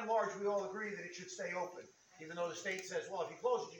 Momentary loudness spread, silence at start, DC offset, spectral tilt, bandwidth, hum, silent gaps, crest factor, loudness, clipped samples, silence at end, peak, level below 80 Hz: 12 LU; 0 s; under 0.1%; -3.5 dB/octave; 19 kHz; none; none; 16 dB; -41 LUFS; under 0.1%; 0 s; -24 dBFS; -90 dBFS